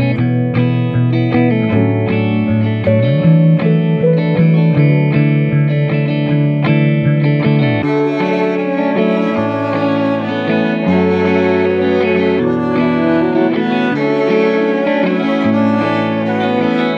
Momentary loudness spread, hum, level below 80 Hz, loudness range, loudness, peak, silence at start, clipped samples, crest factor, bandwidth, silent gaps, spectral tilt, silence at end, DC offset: 4 LU; none; -50 dBFS; 2 LU; -13 LUFS; 0 dBFS; 0 s; under 0.1%; 12 dB; 6.2 kHz; none; -9.5 dB/octave; 0 s; under 0.1%